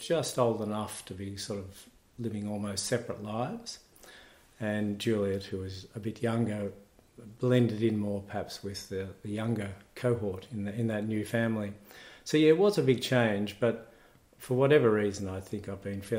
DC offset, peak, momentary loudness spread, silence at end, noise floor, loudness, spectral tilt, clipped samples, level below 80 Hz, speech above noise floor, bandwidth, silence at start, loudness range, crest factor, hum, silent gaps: under 0.1%; -10 dBFS; 15 LU; 0 s; -60 dBFS; -31 LUFS; -6 dB/octave; under 0.1%; -66 dBFS; 29 dB; 16 kHz; 0 s; 8 LU; 20 dB; none; none